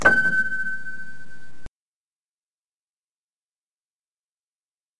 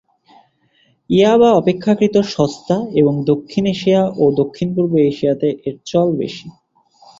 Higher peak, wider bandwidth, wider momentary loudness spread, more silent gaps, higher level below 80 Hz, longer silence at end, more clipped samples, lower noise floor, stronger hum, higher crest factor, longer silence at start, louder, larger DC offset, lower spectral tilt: about the same, -2 dBFS vs -2 dBFS; first, 11.5 kHz vs 7.8 kHz; first, 22 LU vs 8 LU; first, 1.69-4.88 s vs none; about the same, -54 dBFS vs -54 dBFS; second, 0 s vs 0.7 s; neither; first, under -90 dBFS vs -58 dBFS; neither; first, 26 dB vs 14 dB; second, 0 s vs 1.1 s; second, -22 LUFS vs -16 LUFS; neither; second, -4 dB/octave vs -7 dB/octave